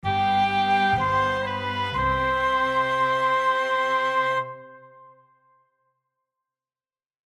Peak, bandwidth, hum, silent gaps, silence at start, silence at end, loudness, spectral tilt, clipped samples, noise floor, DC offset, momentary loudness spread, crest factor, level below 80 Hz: -12 dBFS; 12 kHz; none; none; 0.05 s; 2.45 s; -23 LUFS; -5 dB/octave; under 0.1%; under -90 dBFS; under 0.1%; 6 LU; 12 dB; -48 dBFS